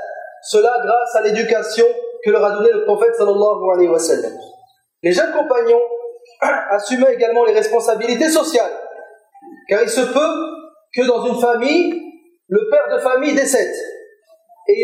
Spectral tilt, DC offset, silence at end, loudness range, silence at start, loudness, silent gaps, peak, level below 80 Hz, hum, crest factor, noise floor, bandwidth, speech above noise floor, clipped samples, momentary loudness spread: -3.5 dB/octave; under 0.1%; 0 s; 3 LU; 0 s; -16 LUFS; none; -4 dBFS; -76 dBFS; none; 14 dB; -50 dBFS; 16 kHz; 35 dB; under 0.1%; 12 LU